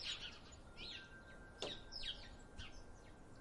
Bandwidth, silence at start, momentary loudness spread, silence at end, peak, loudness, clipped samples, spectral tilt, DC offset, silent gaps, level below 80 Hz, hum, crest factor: 11.5 kHz; 0 s; 13 LU; 0 s; -28 dBFS; -51 LUFS; under 0.1%; -2.5 dB/octave; under 0.1%; none; -60 dBFS; none; 24 dB